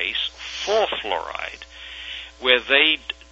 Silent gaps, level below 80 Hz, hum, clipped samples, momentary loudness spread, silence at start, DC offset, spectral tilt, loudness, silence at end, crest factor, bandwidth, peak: none; -50 dBFS; none; under 0.1%; 17 LU; 0 s; under 0.1%; -1.5 dB/octave; -20 LUFS; 0.2 s; 22 dB; 8.2 kHz; -2 dBFS